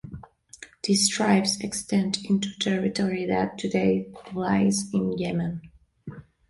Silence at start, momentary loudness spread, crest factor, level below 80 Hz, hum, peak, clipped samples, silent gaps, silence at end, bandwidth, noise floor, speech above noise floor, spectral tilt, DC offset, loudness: 0.05 s; 21 LU; 18 dB; -56 dBFS; none; -8 dBFS; under 0.1%; none; 0.3 s; 11.5 kHz; -49 dBFS; 24 dB; -4.5 dB/octave; under 0.1%; -25 LUFS